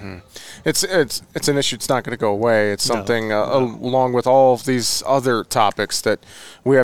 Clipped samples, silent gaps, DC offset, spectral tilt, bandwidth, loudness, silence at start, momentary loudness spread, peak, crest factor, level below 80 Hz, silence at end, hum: under 0.1%; none; 0.8%; -4 dB/octave; 19 kHz; -18 LUFS; 0 s; 7 LU; -2 dBFS; 16 dB; -54 dBFS; 0 s; none